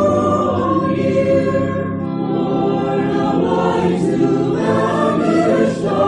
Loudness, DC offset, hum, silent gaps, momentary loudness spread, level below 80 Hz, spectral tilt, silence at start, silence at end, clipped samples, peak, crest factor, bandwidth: -16 LUFS; under 0.1%; none; none; 4 LU; -44 dBFS; -7.5 dB/octave; 0 s; 0 s; under 0.1%; -2 dBFS; 12 dB; 11 kHz